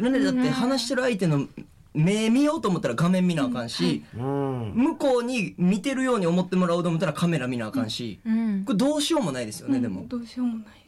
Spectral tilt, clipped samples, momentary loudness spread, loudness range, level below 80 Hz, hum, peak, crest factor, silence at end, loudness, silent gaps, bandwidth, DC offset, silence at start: -6 dB/octave; under 0.1%; 7 LU; 2 LU; -58 dBFS; none; -14 dBFS; 10 dB; 0.15 s; -25 LUFS; none; 13.5 kHz; under 0.1%; 0 s